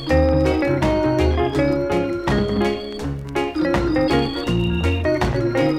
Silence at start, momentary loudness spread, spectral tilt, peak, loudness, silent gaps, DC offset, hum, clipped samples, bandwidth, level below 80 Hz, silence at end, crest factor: 0 s; 6 LU; -7 dB/octave; -4 dBFS; -20 LUFS; none; under 0.1%; none; under 0.1%; 13.5 kHz; -30 dBFS; 0 s; 16 dB